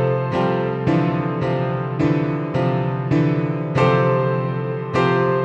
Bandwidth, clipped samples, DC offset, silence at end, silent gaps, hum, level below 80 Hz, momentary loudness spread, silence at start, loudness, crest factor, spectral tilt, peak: 7.8 kHz; under 0.1%; under 0.1%; 0 s; none; none; -50 dBFS; 5 LU; 0 s; -20 LUFS; 14 dB; -8.5 dB/octave; -6 dBFS